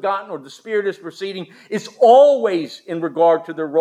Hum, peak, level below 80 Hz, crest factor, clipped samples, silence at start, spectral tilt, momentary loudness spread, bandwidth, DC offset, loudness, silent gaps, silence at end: none; -2 dBFS; -84 dBFS; 16 dB; under 0.1%; 0.05 s; -5.5 dB/octave; 18 LU; 11 kHz; under 0.1%; -17 LUFS; none; 0 s